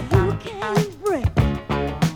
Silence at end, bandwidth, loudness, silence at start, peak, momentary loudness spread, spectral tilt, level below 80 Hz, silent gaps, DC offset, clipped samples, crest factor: 0 s; 18 kHz; -22 LUFS; 0 s; -4 dBFS; 5 LU; -7 dB/octave; -32 dBFS; none; under 0.1%; under 0.1%; 18 dB